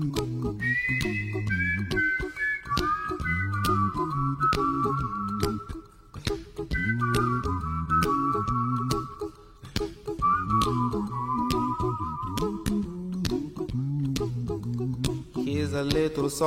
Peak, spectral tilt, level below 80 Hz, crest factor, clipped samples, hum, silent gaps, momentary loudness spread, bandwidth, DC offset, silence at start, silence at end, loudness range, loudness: -10 dBFS; -6 dB/octave; -42 dBFS; 18 dB; under 0.1%; none; none; 8 LU; 16 kHz; under 0.1%; 0 s; 0 s; 3 LU; -28 LUFS